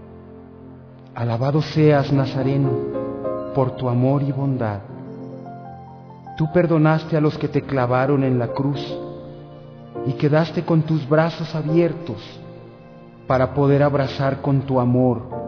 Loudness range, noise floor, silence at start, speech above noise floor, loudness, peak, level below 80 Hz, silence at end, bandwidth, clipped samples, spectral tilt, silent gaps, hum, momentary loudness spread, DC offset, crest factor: 3 LU; -42 dBFS; 0 s; 23 dB; -20 LUFS; -6 dBFS; -50 dBFS; 0 s; 5.4 kHz; under 0.1%; -9 dB/octave; none; none; 21 LU; under 0.1%; 16 dB